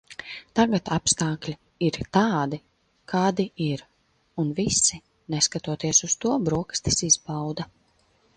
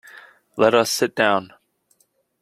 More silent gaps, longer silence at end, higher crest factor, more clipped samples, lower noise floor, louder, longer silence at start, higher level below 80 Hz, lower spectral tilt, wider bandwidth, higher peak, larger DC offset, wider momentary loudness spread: neither; second, 0.7 s vs 0.95 s; about the same, 20 dB vs 22 dB; neither; about the same, -64 dBFS vs -64 dBFS; second, -24 LUFS vs -19 LUFS; about the same, 0.1 s vs 0.15 s; first, -52 dBFS vs -64 dBFS; about the same, -3.5 dB/octave vs -3 dB/octave; second, 10.5 kHz vs 16 kHz; second, -6 dBFS vs 0 dBFS; neither; first, 15 LU vs 7 LU